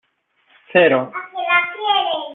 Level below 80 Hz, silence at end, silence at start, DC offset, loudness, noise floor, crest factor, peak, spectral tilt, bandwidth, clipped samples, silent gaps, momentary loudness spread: -66 dBFS; 0 s; 0.7 s; under 0.1%; -17 LUFS; -62 dBFS; 16 dB; -2 dBFS; -8 dB/octave; 4.1 kHz; under 0.1%; none; 9 LU